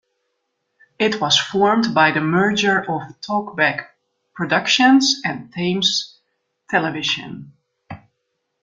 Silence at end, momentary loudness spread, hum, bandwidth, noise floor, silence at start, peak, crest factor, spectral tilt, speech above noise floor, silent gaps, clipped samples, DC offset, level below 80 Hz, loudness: 0.65 s; 12 LU; none; 9 kHz; -74 dBFS; 1 s; -2 dBFS; 18 dB; -3.5 dB/octave; 56 dB; none; under 0.1%; under 0.1%; -60 dBFS; -18 LUFS